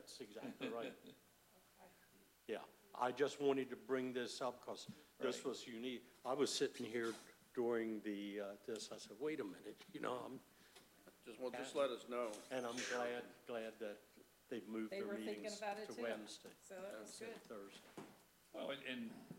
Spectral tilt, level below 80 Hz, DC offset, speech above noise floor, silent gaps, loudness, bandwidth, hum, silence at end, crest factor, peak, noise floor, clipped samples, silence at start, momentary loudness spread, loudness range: -3.5 dB/octave; -88 dBFS; under 0.1%; 25 dB; none; -46 LUFS; 16 kHz; none; 0 s; 22 dB; -26 dBFS; -71 dBFS; under 0.1%; 0 s; 17 LU; 6 LU